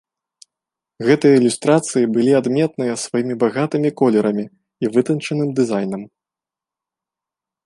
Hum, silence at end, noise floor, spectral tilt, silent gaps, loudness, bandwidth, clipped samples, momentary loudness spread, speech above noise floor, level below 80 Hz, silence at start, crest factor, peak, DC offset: none; 1.6 s; -88 dBFS; -6 dB/octave; none; -18 LUFS; 11.5 kHz; under 0.1%; 9 LU; 71 dB; -66 dBFS; 1 s; 16 dB; -2 dBFS; under 0.1%